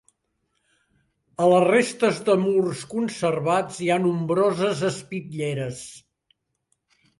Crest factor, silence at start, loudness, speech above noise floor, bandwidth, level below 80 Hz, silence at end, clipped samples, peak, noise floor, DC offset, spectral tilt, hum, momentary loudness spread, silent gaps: 18 dB; 1.4 s; -23 LUFS; 52 dB; 11.5 kHz; -64 dBFS; 1.2 s; under 0.1%; -6 dBFS; -74 dBFS; under 0.1%; -5.5 dB/octave; none; 14 LU; none